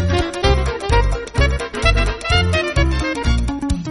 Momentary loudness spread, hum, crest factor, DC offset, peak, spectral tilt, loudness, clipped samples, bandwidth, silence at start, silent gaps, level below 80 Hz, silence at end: 4 LU; none; 16 dB; under 0.1%; 0 dBFS; -5.5 dB/octave; -18 LUFS; under 0.1%; 11.5 kHz; 0 s; none; -20 dBFS; 0 s